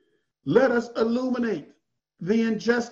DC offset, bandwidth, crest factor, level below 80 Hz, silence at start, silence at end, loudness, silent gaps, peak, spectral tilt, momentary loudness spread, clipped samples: under 0.1%; 7.6 kHz; 20 dB; -64 dBFS; 0.45 s; 0 s; -24 LUFS; none; -6 dBFS; -6 dB/octave; 13 LU; under 0.1%